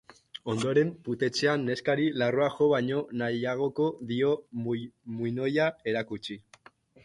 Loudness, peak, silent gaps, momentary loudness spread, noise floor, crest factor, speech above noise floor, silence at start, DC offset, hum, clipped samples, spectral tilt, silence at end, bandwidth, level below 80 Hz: -29 LUFS; -12 dBFS; none; 11 LU; -58 dBFS; 16 dB; 29 dB; 0.45 s; under 0.1%; none; under 0.1%; -6 dB/octave; 0.65 s; 11.5 kHz; -68 dBFS